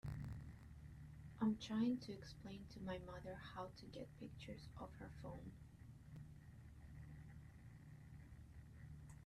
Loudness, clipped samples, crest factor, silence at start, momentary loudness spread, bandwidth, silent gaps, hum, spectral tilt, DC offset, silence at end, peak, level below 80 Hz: -51 LUFS; under 0.1%; 20 dB; 0.05 s; 18 LU; 13.5 kHz; none; none; -7 dB/octave; under 0.1%; 0 s; -30 dBFS; -64 dBFS